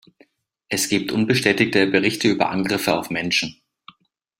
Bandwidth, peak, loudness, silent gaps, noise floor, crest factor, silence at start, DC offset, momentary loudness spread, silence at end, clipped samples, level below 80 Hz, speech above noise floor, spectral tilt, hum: 16.5 kHz; -2 dBFS; -20 LUFS; none; -59 dBFS; 20 dB; 0.7 s; under 0.1%; 6 LU; 0.85 s; under 0.1%; -58 dBFS; 39 dB; -4 dB/octave; none